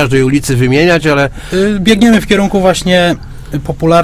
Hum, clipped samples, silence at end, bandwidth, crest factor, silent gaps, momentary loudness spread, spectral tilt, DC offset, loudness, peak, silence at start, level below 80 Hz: none; 0.3%; 0 s; 16 kHz; 10 dB; none; 9 LU; -5.5 dB/octave; under 0.1%; -10 LUFS; 0 dBFS; 0 s; -30 dBFS